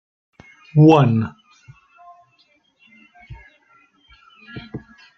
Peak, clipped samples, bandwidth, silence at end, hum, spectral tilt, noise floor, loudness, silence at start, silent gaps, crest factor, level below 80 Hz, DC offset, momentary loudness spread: -2 dBFS; under 0.1%; 6.2 kHz; 0.4 s; none; -9 dB/octave; -60 dBFS; -15 LUFS; 0.75 s; none; 20 dB; -54 dBFS; under 0.1%; 26 LU